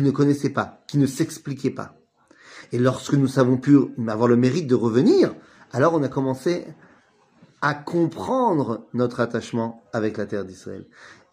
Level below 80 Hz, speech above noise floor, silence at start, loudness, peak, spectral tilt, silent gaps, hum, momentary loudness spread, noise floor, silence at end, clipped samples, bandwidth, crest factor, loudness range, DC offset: -62 dBFS; 36 dB; 0 s; -22 LUFS; -4 dBFS; -7 dB/octave; none; none; 12 LU; -58 dBFS; 0.2 s; under 0.1%; 15.5 kHz; 18 dB; 5 LU; under 0.1%